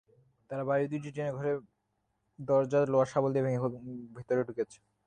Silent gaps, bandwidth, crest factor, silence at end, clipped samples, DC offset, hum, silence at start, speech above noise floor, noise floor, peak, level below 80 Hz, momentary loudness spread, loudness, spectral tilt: none; 9.6 kHz; 18 dB; 0.3 s; under 0.1%; under 0.1%; none; 0.5 s; 48 dB; -79 dBFS; -14 dBFS; -70 dBFS; 14 LU; -31 LUFS; -8 dB/octave